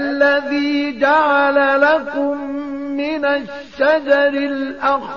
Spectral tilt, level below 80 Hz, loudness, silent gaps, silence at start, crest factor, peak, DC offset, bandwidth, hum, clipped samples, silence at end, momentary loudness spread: -4.5 dB/octave; -56 dBFS; -16 LUFS; none; 0 s; 14 dB; -2 dBFS; 0.4%; 7 kHz; none; under 0.1%; 0 s; 10 LU